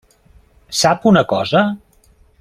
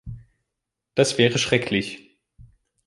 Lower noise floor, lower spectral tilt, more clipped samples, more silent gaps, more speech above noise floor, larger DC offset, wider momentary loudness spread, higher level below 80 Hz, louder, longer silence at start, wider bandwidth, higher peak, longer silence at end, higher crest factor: second, -52 dBFS vs -83 dBFS; about the same, -4.5 dB/octave vs -4 dB/octave; neither; neither; second, 38 dB vs 62 dB; neither; second, 10 LU vs 22 LU; about the same, -50 dBFS vs -52 dBFS; first, -15 LUFS vs -21 LUFS; first, 0.7 s vs 0.05 s; first, 15 kHz vs 11.5 kHz; about the same, -2 dBFS vs -2 dBFS; first, 0.65 s vs 0.45 s; second, 16 dB vs 22 dB